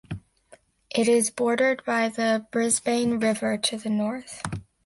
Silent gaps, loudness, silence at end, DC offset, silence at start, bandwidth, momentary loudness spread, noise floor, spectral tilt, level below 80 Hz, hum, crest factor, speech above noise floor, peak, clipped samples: none; -24 LUFS; 0.25 s; under 0.1%; 0.1 s; 12 kHz; 12 LU; -56 dBFS; -3.5 dB/octave; -58 dBFS; none; 16 dB; 32 dB; -10 dBFS; under 0.1%